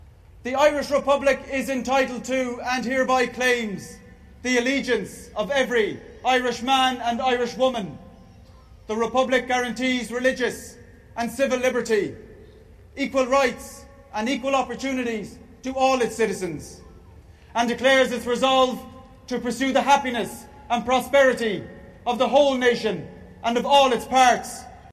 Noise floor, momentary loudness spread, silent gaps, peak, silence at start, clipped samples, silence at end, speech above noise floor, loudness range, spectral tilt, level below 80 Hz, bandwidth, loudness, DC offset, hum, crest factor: -48 dBFS; 15 LU; none; -6 dBFS; 0.35 s; under 0.1%; 0.05 s; 26 dB; 4 LU; -3.5 dB/octave; -52 dBFS; 14 kHz; -22 LUFS; under 0.1%; none; 16 dB